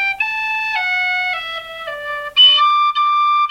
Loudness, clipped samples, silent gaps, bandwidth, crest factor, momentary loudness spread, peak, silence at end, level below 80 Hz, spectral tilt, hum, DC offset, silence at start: -14 LUFS; under 0.1%; none; 16 kHz; 14 dB; 17 LU; -2 dBFS; 0 s; -56 dBFS; 1 dB/octave; none; under 0.1%; 0 s